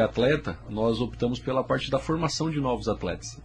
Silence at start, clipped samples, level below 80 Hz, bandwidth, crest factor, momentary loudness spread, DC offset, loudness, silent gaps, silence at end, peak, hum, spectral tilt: 0 s; under 0.1%; -44 dBFS; 10.5 kHz; 16 dB; 5 LU; under 0.1%; -27 LUFS; none; 0 s; -10 dBFS; none; -5.5 dB/octave